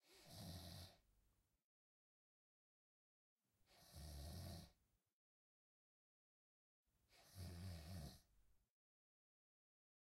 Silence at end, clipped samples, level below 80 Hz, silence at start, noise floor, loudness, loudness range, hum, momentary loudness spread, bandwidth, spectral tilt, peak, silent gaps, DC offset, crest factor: 1.45 s; under 0.1%; -70 dBFS; 0.05 s; -84 dBFS; -58 LUFS; 4 LU; none; 9 LU; 16 kHz; -5 dB/octave; -44 dBFS; 1.64-3.36 s, 5.13-6.85 s; under 0.1%; 18 dB